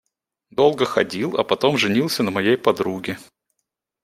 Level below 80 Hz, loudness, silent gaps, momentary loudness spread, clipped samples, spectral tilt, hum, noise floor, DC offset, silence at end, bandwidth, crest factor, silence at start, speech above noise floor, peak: -64 dBFS; -20 LUFS; none; 11 LU; under 0.1%; -5 dB/octave; none; -79 dBFS; under 0.1%; 0.8 s; 16 kHz; 20 dB; 0.6 s; 59 dB; -2 dBFS